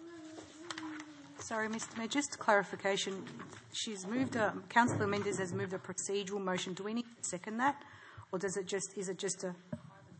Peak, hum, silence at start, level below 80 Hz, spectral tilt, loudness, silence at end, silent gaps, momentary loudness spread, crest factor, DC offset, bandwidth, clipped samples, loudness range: -14 dBFS; none; 0 s; -80 dBFS; -3.5 dB/octave; -36 LUFS; 0 s; none; 17 LU; 24 dB; under 0.1%; 8.8 kHz; under 0.1%; 4 LU